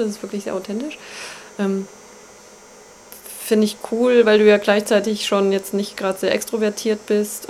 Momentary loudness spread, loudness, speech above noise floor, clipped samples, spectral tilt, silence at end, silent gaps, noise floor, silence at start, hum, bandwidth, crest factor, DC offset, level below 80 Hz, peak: 19 LU; -19 LUFS; 25 dB; under 0.1%; -4.5 dB/octave; 0 s; none; -44 dBFS; 0 s; none; 16 kHz; 18 dB; under 0.1%; -64 dBFS; -2 dBFS